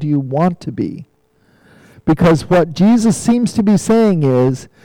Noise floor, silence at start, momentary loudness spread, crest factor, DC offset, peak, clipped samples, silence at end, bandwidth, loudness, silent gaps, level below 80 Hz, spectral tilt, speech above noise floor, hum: -55 dBFS; 0 s; 11 LU; 8 dB; under 0.1%; -6 dBFS; under 0.1%; 0.2 s; 15.5 kHz; -14 LUFS; none; -42 dBFS; -7 dB/octave; 42 dB; none